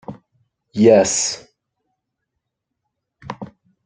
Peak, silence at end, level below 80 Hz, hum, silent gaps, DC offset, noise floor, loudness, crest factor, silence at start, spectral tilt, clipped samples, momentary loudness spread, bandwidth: 0 dBFS; 0.4 s; -60 dBFS; none; none; under 0.1%; -78 dBFS; -15 LUFS; 20 dB; 0.1 s; -4 dB/octave; under 0.1%; 24 LU; 9.6 kHz